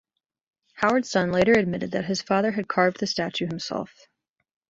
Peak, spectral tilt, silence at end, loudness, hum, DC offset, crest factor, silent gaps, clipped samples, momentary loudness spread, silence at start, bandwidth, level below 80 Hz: -6 dBFS; -5 dB/octave; 0.85 s; -24 LUFS; none; under 0.1%; 20 dB; none; under 0.1%; 10 LU; 0.75 s; 7.8 kHz; -58 dBFS